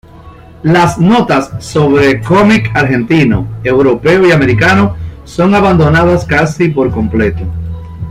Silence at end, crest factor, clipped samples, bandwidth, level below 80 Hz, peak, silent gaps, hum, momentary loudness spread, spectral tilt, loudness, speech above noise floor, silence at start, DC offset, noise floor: 0 s; 10 dB; under 0.1%; 14 kHz; -30 dBFS; 0 dBFS; none; none; 9 LU; -7 dB/octave; -9 LUFS; 25 dB; 0.15 s; under 0.1%; -33 dBFS